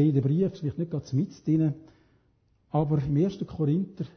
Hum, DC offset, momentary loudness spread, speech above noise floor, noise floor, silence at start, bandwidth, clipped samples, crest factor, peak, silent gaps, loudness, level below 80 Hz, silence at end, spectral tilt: none; under 0.1%; 6 LU; 41 dB; -67 dBFS; 0 s; 6.6 kHz; under 0.1%; 16 dB; -12 dBFS; none; -28 LUFS; -56 dBFS; 0.1 s; -10 dB/octave